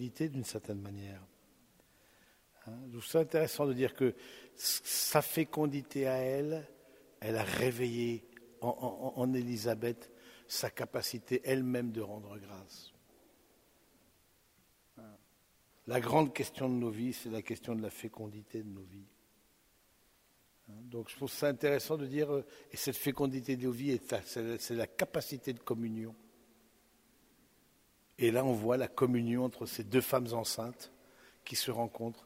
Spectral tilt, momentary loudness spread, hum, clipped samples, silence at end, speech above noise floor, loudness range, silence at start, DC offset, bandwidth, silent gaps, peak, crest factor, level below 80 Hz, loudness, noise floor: -4.5 dB/octave; 18 LU; none; under 0.1%; 0.05 s; 34 dB; 10 LU; 0 s; under 0.1%; 16 kHz; none; -12 dBFS; 26 dB; -72 dBFS; -35 LUFS; -70 dBFS